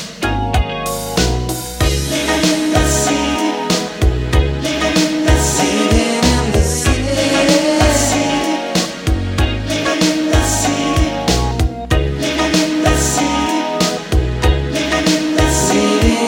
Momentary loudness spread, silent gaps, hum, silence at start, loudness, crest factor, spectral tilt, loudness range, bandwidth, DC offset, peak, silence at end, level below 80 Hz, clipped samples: 5 LU; none; none; 0 s; -15 LUFS; 14 dB; -4 dB/octave; 2 LU; 17 kHz; under 0.1%; 0 dBFS; 0 s; -22 dBFS; under 0.1%